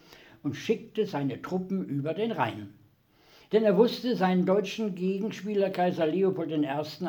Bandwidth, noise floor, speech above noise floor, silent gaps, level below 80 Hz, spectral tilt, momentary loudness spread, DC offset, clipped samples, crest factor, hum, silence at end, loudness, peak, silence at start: 19.5 kHz; -62 dBFS; 34 dB; none; -74 dBFS; -7 dB/octave; 8 LU; under 0.1%; under 0.1%; 18 dB; none; 0 s; -28 LUFS; -10 dBFS; 0.1 s